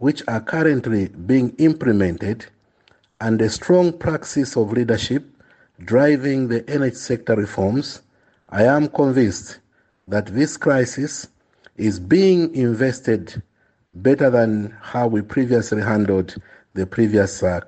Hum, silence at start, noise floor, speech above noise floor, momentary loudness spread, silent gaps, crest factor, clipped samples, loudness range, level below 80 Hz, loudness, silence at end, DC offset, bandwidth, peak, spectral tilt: none; 0 s; -59 dBFS; 40 dB; 11 LU; none; 16 dB; under 0.1%; 2 LU; -52 dBFS; -19 LUFS; 0.05 s; under 0.1%; 8.8 kHz; -4 dBFS; -6.5 dB/octave